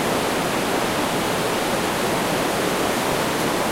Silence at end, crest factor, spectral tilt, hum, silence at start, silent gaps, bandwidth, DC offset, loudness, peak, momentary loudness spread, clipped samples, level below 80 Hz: 0 s; 12 dB; -3.5 dB/octave; none; 0 s; none; 16 kHz; under 0.1%; -21 LUFS; -8 dBFS; 1 LU; under 0.1%; -46 dBFS